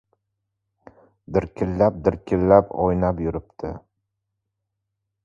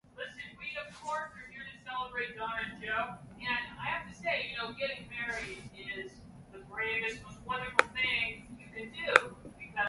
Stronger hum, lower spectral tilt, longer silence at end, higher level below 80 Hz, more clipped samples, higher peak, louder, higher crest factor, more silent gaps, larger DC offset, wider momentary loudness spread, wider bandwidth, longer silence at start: neither; first, -10 dB/octave vs -3 dB/octave; first, 1.45 s vs 0 s; first, -42 dBFS vs -62 dBFS; neither; about the same, 0 dBFS vs 0 dBFS; first, -21 LUFS vs -34 LUFS; second, 24 dB vs 36 dB; neither; neither; about the same, 17 LU vs 17 LU; second, 7.2 kHz vs 11.5 kHz; first, 1.3 s vs 0.15 s